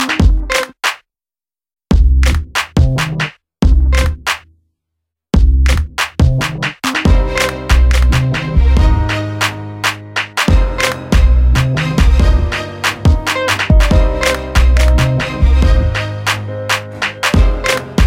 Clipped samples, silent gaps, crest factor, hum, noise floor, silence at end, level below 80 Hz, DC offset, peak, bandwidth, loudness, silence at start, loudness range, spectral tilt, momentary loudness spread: under 0.1%; none; 12 dB; none; under -90 dBFS; 0 s; -14 dBFS; under 0.1%; 0 dBFS; 16 kHz; -14 LUFS; 0 s; 3 LU; -5 dB/octave; 7 LU